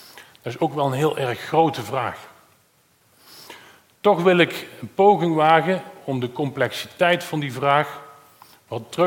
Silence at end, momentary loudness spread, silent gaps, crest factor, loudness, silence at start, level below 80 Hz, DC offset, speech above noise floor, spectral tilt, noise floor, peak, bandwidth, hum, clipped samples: 0 s; 17 LU; none; 20 dB; -21 LUFS; 0.15 s; -68 dBFS; under 0.1%; 40 dB; -6 dB/octave; -60 dBFS; -2 dBFS; 17 kHz; none; under 0.1%